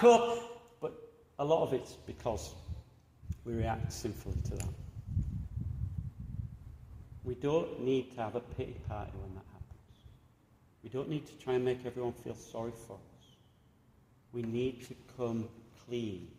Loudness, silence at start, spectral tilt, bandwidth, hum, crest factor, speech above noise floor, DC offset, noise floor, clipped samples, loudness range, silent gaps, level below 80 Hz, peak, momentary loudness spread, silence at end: -37 LUFS; 0 s; -6.5 dB/octave; 15.5 kHz; none; 24 dB; 31 dB; under 0.1%; -65 dBFS; under 0.1%; 5 LU; none; -52 dBFS; -12 dBFS; 18 LU; 0 s